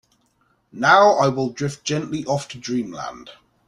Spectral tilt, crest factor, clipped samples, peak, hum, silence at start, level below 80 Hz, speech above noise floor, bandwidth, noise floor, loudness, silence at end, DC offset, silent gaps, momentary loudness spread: -5 dB/octave; 20 dB; under 0.1%; -2 dBFS; none; 0.75 s; -60 dBFS; 45 dB; 11.5 kHz; -64 dBFS; -19 LUFS; 0.35 s; under 0.1%; none; 15 LU